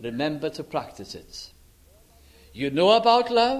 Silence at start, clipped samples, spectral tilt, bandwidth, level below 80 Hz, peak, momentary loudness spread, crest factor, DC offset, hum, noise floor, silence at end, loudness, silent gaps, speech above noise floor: 0 s; under 0.1%; -5 dB/octave; 15 kHz; -56 dBFS; -4 dBFS; 22 LU; 20 dB; under 0.1%; none; -55 dBFS; 0 s; -22 LUFS; none; 32 dB